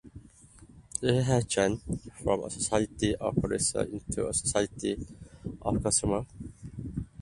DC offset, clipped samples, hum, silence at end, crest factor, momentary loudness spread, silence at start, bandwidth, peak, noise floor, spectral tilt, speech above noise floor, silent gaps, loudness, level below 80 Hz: under 0.1%; under 0.1%; none; 0 s; 20 dB; 15 LU; 0.05 s; 11.5 kHz; -10 dBFS; -54 dBFS; -4.5 dB/octave; 25 dB; none; -30 LUFS; -48 dBFS